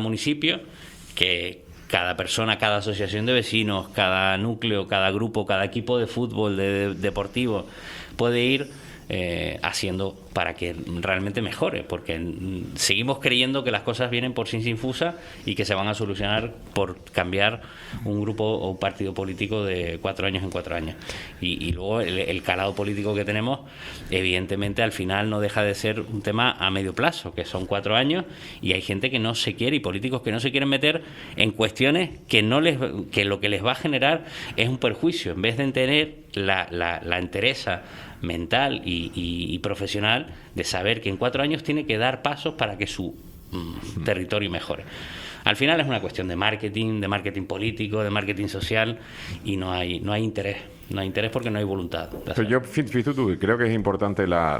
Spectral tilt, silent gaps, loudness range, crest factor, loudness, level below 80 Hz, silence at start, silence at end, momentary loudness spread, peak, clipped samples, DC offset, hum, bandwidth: -5 dB/octave; none; 5 LU; 26 dB; -25 LUFS; -50 dBFS; 0 s; 0 s; 10 LU; 0 dBFS; under 0.1%; under 0.1%; none; 16 kHz